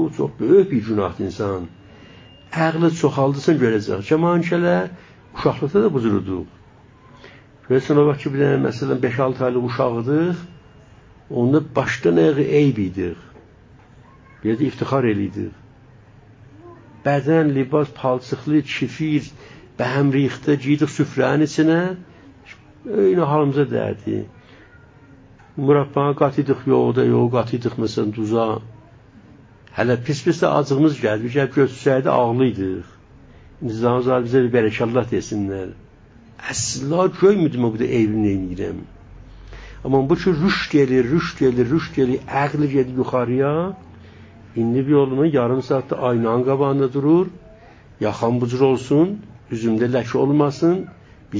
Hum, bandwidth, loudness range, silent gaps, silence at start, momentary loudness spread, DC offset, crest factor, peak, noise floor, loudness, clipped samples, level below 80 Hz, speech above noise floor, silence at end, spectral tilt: none; 7.8 kHz; 3 LU; none; 0 s; 11 LU; under 0.1%; 18 dB; -2 dBFS; -48 dBFS; -19 LUFS; under 0.1%; -48 dBFS; 29 dB; 0 s; -7 dB/octave